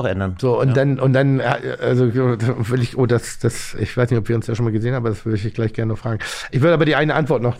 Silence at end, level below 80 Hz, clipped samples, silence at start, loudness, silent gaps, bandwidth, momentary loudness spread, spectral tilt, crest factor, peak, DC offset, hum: 0 s; -44 dBFS; under 0.1%; 0 s; -19 LUFS; none; 14 kHz; 7 LU; -7 dB/octave; 16 dB; -2 dBFS; 0.1%; none